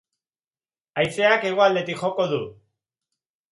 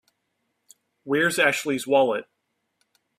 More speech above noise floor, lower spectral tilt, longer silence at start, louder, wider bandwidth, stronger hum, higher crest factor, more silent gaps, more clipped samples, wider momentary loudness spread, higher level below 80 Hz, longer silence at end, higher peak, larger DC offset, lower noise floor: first, over 69 dB vs 54 dB; first, -5 dB/octave vs -3.5 dB/octave; about the same, 0.95 s vs 1.05 s; about the same, -21 LUFS vs -22 LUFS; second, 11.5 kHz vs 15.5 kHz; neither; about the same, 20 dB vs 20 dB; neither; neither; first, 11 LU vs 7 LU; first, -64 dBFS vs -72 dBFS; about the same, 1 s vs 0.95 s; about the same, -4 dBFS vs -6 dBFS; neither; first, under -90 dBFS vs -76 dBFS